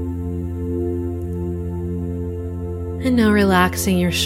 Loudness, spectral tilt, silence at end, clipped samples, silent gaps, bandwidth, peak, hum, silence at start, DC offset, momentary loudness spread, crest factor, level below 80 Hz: -21 LUFS; -5.5 dB/octave; 0 s; under 0.1%; none; 16 kHz; -2 dBFS; none; 0 s; under 0.1%; 12 LU; 18 dB; -34 dBFS